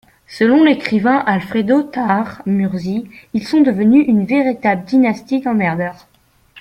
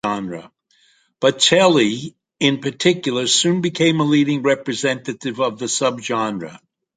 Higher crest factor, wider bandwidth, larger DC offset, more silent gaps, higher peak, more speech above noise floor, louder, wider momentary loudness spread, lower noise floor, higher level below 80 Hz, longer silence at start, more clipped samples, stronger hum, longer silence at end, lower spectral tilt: about the same, 14 dB vs 18 dB; first, 11 kHz vs 9.6 kHz; neither; neither; about the same, -2 dBFS vs -2 dBFS; second, 34 dB vs 40 dB; first, -15 LUFS vs -18 LUFS; about the same, 11 LU vs 13 LU; second, -48 dBFS vs -58 dBFS; first, -54 dBFS vs -62 dBFS; first, 0.3 s vs 0.05 s; neither; neither; second, 0 s vs 0.4 s; first, -7.5 dB/octave vs -4 dB/octave